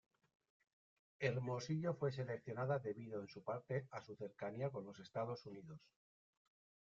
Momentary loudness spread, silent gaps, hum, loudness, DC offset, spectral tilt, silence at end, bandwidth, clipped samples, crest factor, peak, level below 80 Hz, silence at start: 11 LU; none; none; -45 LUFS; under 0.1%; -6.5 dB/octave; 1.05 s; 7.4 kHz; under 0.1%; 22 dB; -24 dBFS; -82 dBFS; 1.2 s